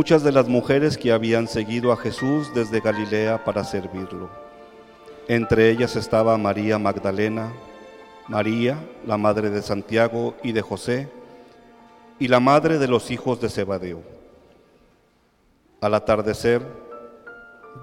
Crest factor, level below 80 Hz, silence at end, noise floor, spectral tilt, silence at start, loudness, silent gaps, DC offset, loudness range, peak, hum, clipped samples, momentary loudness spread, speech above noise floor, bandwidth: 18 dB; -52 dBFS; 0 s; -61 dBFS; -6.5 dB/octave; 0 s; -21 LUFS; none; under 0.1%; 5 LU; -4 dBFS; none; under 0.1%; 18 LU; 40 dB; 15.5 kHz